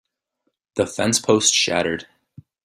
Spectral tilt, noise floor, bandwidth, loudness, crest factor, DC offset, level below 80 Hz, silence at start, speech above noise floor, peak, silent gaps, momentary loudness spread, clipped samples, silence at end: -2.5 dB/octave; -74 dBFS; 15 kHz; -19 LUFS; 20 dB; under 0.1%; -60 dBFS; 0.75 s; 55 dB; -2 dBFS; none; 13 LU; under 0.1%; 0.6 s